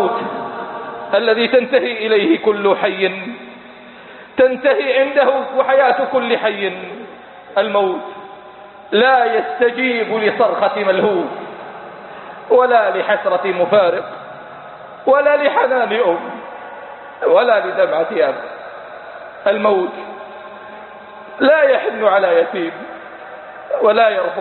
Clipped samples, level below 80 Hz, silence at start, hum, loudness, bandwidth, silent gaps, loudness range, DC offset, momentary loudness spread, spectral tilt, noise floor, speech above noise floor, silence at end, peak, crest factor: under 0.1%; -64 dBFS; 0 s; none; -15 LUFS; 4.3 kHz; none; 3 LU; under 0.1%; 21 LU; -9.5 dB/octave; -38 dBFS; 23 dB; 0 s; 0 dBFS; 16 dB